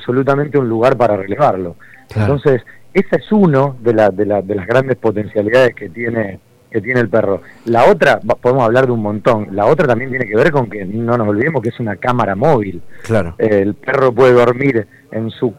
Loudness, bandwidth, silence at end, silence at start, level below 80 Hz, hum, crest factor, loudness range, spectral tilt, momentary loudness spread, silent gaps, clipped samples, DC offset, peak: -14 LUFS; 13.5 kHz; 0.05 s; 0 s; -46 dBFS; none; 12 dB; 3 LU; -8 dB/octave; 10 LU; none; under 0.1%; under 0.1%; 0 dBFS